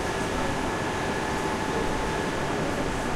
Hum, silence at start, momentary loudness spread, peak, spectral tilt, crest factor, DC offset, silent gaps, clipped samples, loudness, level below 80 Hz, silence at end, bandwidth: none; 0 s; 1 LU; -14 dBFS; -4.5 dB/octave; 12 dB; under 0.1%; none; under 0.1%; -28 LUFS; -40 dBFS; 0 s; 16 kHz